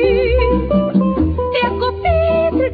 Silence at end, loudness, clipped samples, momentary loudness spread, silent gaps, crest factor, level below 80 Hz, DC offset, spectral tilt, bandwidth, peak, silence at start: 0 s; -15 LUFS; under 0.1%; 3 LU; none; 12 dB; -24 dBFS; under 0.1%; -10 dB/octave; 5 kHz; -2 dBFS; 0 s